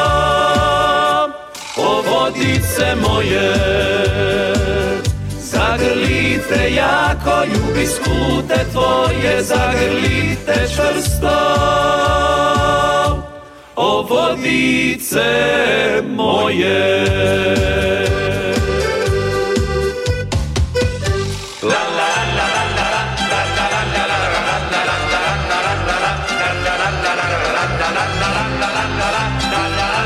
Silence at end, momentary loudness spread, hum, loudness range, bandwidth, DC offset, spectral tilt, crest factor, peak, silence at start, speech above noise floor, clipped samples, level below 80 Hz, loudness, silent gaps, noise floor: 0 s; 4 LU; none; 3 LU; 16 kHz; under 0.1%; -4.5 dB/octave; 14 dB; -2 dBFS; 0 s; 21 dB; under 0.1%; -30 dBFS; -15 LUFS; none; -36 dBFS